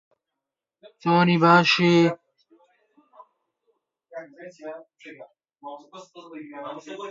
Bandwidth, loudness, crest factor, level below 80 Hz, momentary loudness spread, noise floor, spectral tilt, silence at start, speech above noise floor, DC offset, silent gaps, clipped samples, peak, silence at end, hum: 7.6 kHz; -19 LUFS; 24 dB; -72 dBFS; 27 LU; -86 dBFS; -6 dB/octave; 1.05 s; 63 dB; under 0.1%; none; under 0.1%; -2 dBFS; 0 s; none